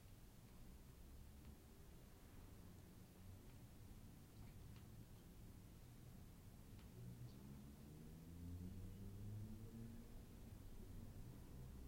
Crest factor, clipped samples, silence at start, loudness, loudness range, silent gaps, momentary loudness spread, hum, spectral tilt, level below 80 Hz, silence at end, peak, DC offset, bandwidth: 16 dB; under 0.1%; 0 s; -61 LUFS; 6 LU; none; 8 LU; none; -6.5 dB/octave; -64 dBFS; 0 s; -44 dBFS; under 0.1%; 16.5 kHz